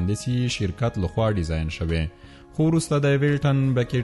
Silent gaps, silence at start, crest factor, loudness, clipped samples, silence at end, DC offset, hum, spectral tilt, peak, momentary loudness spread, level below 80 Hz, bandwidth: none; 0 s; 12 dB; -23 LUFS; under 0.1%; 0 s; under 0.1%; none; -6.5 dB/octave; -10 dBFS; 6 LU; -38 dBFS; 11.5 kHz